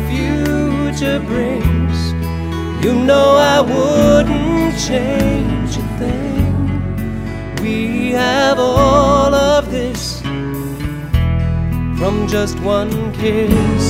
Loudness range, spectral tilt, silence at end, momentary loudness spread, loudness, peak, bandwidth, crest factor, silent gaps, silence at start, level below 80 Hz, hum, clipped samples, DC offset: 5 LU; -6 dB/octave; 0 s; 10 LU; -15 LUFS; 0 dBFS; 16 kHz; 14 dB; none; 0 s; -26 dBFS; none; under 0.1%; under 0.1%